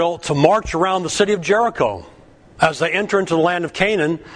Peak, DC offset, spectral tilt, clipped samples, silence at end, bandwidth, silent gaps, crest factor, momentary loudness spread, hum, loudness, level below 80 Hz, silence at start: 0 dBFS; under 0.1%; -4.5 dB/octave; under 0.1%; 0 s; 10.5 kHz; none; 18 dB; 4 LU; none; -18 LUFS; -44 dBFS; 0 s